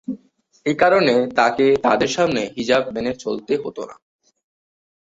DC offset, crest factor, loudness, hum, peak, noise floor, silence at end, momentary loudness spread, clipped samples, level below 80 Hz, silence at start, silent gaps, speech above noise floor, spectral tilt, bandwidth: under 0.1%; 18 dB; -18 LUFS; none; -2 dBFS; -57 dBFS; 1.1 s; 15 LU; under 0.1%; -56 dBFS; 0.1 s; none; 39 dB; -4.5 dB/octave; 8 kHz